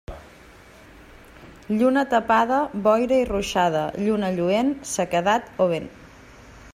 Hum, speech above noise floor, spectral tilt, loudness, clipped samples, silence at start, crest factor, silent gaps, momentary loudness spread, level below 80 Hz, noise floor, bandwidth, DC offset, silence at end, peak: none; 26 dB; -5 dB/octave; -22 LUFS; under 0.1%; 0.1 s; 16 dB; none; 8 LU; -48 dBFS; -48 dBFS; 15.5 kHz; under 0.1%; 0.05 s; -6 dBFS